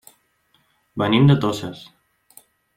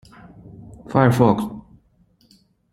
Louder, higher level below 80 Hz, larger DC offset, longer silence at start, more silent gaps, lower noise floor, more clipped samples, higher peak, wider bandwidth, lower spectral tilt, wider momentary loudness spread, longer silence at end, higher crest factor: about the same, -18 LUFS vs -18 LUFS; second, -58 dBFS vs -50 dBFS; neither; first, 0.95 s vs 0.6 s; neither; first, -64 dBFS vs -59 dBFS; neither; about the same, -2 dBFS vs 0 dBFS; about the same, 15 kHz vs 15.5 kHz; about the same, -7 dB/octave vs -8 dB/octave; second, 21 LU vs 26 LU; about the same, 1 s vs 1.1 s; about the same, 20 dB vs 22 dB